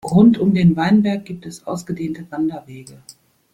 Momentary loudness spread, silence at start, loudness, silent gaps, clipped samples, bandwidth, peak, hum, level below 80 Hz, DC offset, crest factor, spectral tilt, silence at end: 20 LU; 0.05 s; -17 LUFS; none; under 0.1%; 12 kHz; -2 dBFS; none; -52 dBFS; under 0.1%; 16 dB; -7.5 dB/octave; 0.6 s